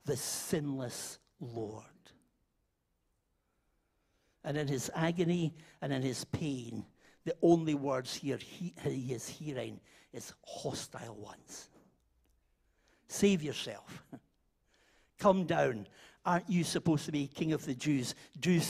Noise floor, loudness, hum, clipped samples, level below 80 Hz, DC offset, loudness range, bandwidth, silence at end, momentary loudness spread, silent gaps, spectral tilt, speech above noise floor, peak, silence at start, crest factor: -80 dBFS; -35 LUFS; none; under 0.1%; -68 dBFS; under 0.1%; 12 LU; 15.5 kHz; 0 s; 18 LU; none; -5.5 dB/octave; 45 dB; -12 dBFS; 0.05 s; 24 dB